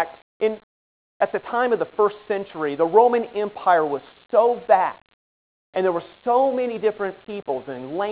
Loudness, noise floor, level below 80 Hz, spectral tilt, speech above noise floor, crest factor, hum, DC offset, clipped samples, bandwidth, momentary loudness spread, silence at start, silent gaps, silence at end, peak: -22 LUFS; under -90 dBFS; -68 dBFS; -9 dB/octave; over 69 dB; 20 dB; none; under 0.1%; under 0.1%; 4 kHz; 11 LU; 0 s; 0.22-0.40 s, 0.63-1.20 s, 5.14-5.73 s; 0 s; -2 dBFS